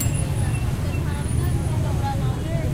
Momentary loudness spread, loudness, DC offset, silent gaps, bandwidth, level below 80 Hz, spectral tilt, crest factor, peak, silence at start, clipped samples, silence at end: 2 LU; -24 LUFS; under 0.1%; none; 16 kHz; -30 dBFS; -6 dB/octave; 12 dB; -10 dBFS; 0 s; under 0.1%; 0 s